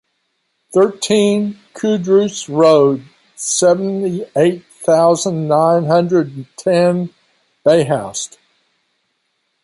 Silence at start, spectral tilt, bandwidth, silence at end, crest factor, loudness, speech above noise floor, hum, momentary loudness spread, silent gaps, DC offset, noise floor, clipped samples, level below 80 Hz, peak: 0.7 s; -5 dB/octave; 11.5 kHz; 1.4 s; 14 dB; -15 LUFS; 54 dB; none; 11 LU; none; under 0.1%; -68 dBFS; under 0.1%; -62 dBFS; -2 dBFS